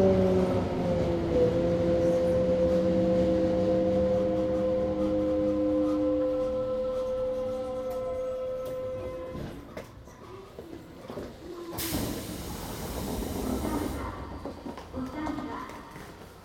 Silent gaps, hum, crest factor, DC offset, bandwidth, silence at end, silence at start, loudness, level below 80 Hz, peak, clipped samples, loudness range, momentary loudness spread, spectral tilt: none; none; 16 dB; under 0.1%; 18 kHz; 0 s; 0 s; -29 LUFS; -46 dBFS; -14 dBFS; under 0.1%; 12 LU; 17 LU; -7 dB/octave